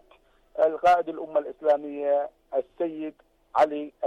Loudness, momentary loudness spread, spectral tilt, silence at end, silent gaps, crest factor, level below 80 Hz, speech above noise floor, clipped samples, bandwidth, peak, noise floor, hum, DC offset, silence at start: -26 LUFS; 10 LU; -5 dB/octave; 0 s; none; 14 dB; -66 dBFS; 35 dB; under 0.1%; 9.6 kHz; -12 dBFS; -60 dBFS; none; under 0.1%; 0.55 s